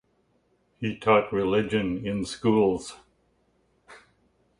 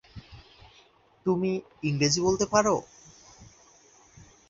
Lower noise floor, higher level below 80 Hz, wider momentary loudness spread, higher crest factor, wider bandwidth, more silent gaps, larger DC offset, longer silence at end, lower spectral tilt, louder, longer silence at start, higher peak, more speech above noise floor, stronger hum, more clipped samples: first, -68 dBFS vs -60 dBFS; about the same, -56 dBFS vs -58 dBFS; about the same, 11 LU vs 10 LU; about the same, 20 dB vs 22 dB; first, 11.5 kHz vs 7.8 kHz; neither; neither; second, 0.65 s vs 1.05 s; first, -6 dB/octave vs -4.5 dB/octave; about the same, -25 LUFS vs -26 LUFS; first, 0.8 s vs 0.15 s; about the same, -6 dBFS vs -8 dBFS; first, 44 dB vs 34 dB; neither; neither